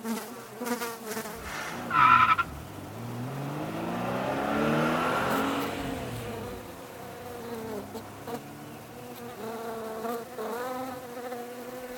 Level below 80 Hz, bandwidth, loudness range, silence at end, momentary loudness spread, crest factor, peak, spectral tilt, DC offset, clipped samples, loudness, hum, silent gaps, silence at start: -56 dBFS; 19.5 kHz; 13 LU; 0 s; 16 LU; 22 dB; -8 dBFS; -5 dB/octave; under 0.1%; under 0.1%; -30 LUFS; none; none; 0 s